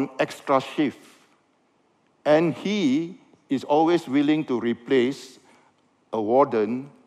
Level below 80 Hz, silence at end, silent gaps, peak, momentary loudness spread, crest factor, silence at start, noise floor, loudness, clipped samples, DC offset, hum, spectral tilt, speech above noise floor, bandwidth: -76 dBFS; 0.2 s; none; -6 dBFS; 9 LU; 18 dB; 0 s; -65 dBFS; -23 LUFS; under 0.1%; under 0.1%; none; -6 dB/octave; 42 dB; 12.5 kHz